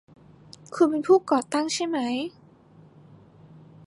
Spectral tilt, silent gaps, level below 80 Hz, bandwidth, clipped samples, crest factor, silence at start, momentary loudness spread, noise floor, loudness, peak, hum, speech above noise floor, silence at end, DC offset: -4 dB/octave; none; -70 dBFS; 11.5 kHz; under 0.1%; 20 dB; 0.7 s; 12 LU; -53 dBFS; -24 LUFS; -8 dBFS; none; 30 dB; 1.6 s; under 0.1%